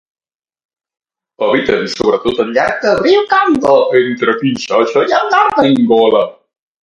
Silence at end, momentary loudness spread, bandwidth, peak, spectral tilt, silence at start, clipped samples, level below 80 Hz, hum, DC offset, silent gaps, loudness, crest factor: 0.5 s; 5 LU; 10.5 kHz; 0 dBFS; -5 dB/octave; 1.4 s; under 0.1%; -50 dBFS; none; under 0.1%; none; -12 LUFS; 12 dB